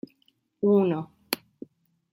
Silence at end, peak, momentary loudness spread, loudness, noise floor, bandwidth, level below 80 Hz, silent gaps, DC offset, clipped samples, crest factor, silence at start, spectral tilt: 0.75 s; -4 dBFS; 11 LU; -26 LUFS; -69 dBFS; 16.5 kHz; -74 dBFS; none; under 0.1%; under 0.1%; 24 dB; 0.6 s; -6 dB/octave